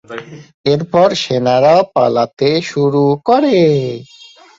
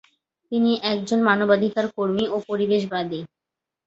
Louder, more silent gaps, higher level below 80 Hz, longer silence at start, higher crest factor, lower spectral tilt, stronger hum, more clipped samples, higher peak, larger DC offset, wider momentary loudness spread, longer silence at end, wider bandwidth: first, -13 LUFS vs -22 LUFS; first, 0.54-0.64 s vs none; first, -54 dBFS vs -64 dBFS; second, 0.1 s vs 0.5 s; second, 12 dB vs 20 dB; about the same, -6.5 dB/octave vs -6 dB/octave; neither; neither; about the same, -2 dBFS vs -4 dBFS; neither; about the same, 11 LU vs 9 LU; about the same, 0.55 s vs 0.6 s; about the same, 7.8 kHz vs 8 kHz